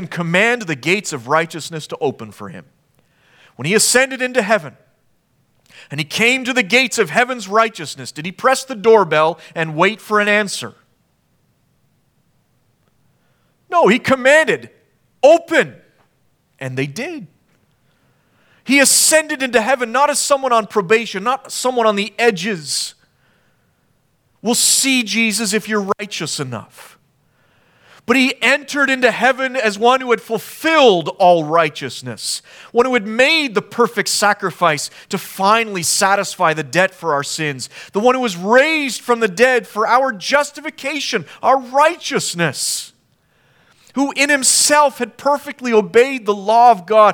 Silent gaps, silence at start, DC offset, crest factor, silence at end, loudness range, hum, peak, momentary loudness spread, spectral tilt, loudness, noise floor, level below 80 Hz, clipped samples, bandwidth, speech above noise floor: none; 0 s; under 0.1%; 16 dB; 0 s; 5 LU; none; 0 dBFS; 13 LU; -2.5 dB/octave; -15 LUFS; -62 dBFS; -66 dBFS; under 0.1%; 19.5 kHz; 46 dB